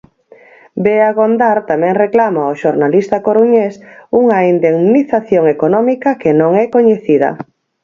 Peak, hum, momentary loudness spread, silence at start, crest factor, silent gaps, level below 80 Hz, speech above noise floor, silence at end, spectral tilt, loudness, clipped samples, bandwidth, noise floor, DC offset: 0 dBFS; none; 4 LU; 0.75 s; 12 dB; none; -56 dBFS; 32 dB; 0.4 s; -8.5 dB/octave; -12 LUFS; under 0.1%; 7.2 kHz; -43 dBFS; under 0.1%